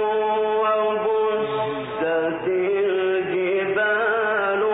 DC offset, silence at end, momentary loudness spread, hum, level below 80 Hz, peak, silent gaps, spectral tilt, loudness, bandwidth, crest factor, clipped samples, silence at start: under 0.1%; 0 s; 3 LU; none; -62 dBFS; -10 dBFS; none; -9.5 dB/octave; -22 LUFS; 4 kHz; 10 dB; under 0.1%; 0 s